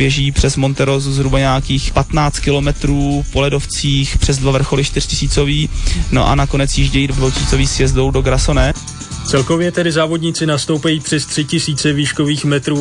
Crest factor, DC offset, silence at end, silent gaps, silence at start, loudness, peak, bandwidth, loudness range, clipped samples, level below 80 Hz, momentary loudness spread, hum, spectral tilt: 12 dB; under 0.1%; 0 s; none; 0 s; -15 LUFS; -2 dBFS; 10.5 kHz; 1 LU; under 0.1%; -22 dBFS; 3 LU; none; -5 dB/octave